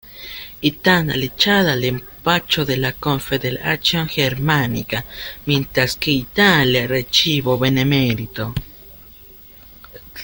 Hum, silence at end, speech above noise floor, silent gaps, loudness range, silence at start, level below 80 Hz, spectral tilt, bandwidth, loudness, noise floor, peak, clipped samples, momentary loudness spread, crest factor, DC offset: none; 0 s; 24 dB; none; 3 LU; 0.05 s; -42 dBFS; -5 dB/octave; 17 kHz; -17 LUFS; -42 dBFS; 0 dBFS; under 0.1%; 12 LU; 18 dB; under 0.1%